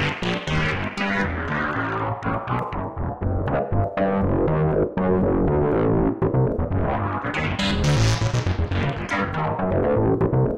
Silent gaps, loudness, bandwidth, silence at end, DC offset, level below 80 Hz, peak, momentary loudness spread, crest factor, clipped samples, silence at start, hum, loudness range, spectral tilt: none; -23 LUFS; 11.5 kHz; 0 s; under 0.1%; -34 dBFS; -8 dBFS; 5 LU; 12 dB; under 0.1%; 0 s; none; 4 LU; -6.5 dB/octave